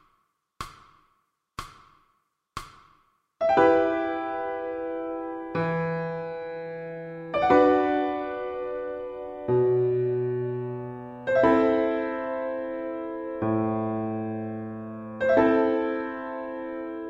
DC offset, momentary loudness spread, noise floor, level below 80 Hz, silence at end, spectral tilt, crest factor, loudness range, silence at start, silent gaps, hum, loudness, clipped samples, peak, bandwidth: under 0.1%; 17 LU; -72 dBFS; -58 dBFS; 0 s; -8 dB/octave; 20 dB; 5 LU; 0.6 s; none; none; -26 LUFS; under 0.1%; -6 dBFS; 10 kHz